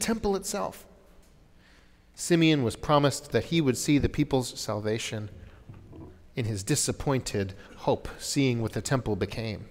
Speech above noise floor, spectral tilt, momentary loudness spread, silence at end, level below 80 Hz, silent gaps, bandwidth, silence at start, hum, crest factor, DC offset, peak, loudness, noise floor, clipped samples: 29 dB; -5 dB/octave; 13 LU; 0 s; -48 dBFS; none; 16 kHz; 0 s; none; 20 dB; under 0.1%; -8 dBFS; -28 LUFS; -57 dBFS; under 0.1%